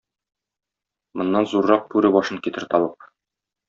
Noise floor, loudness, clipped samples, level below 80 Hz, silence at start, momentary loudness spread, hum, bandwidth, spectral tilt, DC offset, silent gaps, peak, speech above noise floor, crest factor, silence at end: -86 dBFS; -20 LUFS; under 0.1%; -64 dBFS; 1.15 s; 10 LU; none; 7.4 kHz; -4.5 dB/octave; under 0.1%; none; -2 dBFS; 66 dB; 20 dB; 0.75 s